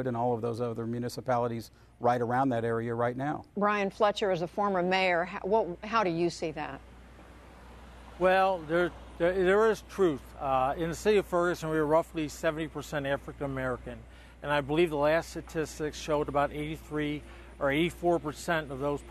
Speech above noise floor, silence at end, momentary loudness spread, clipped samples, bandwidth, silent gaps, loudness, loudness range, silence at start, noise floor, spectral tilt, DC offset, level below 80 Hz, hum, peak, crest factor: 22 dB; 0 s; 9 LU; under 0.1%; 13.5 kHz; none; -30 LUFS; 4 LU; 0 s; -51 dBFS; -6 dB/octave; under 0.1%; -52 dBFS; none; -12 dBFS; 18 dB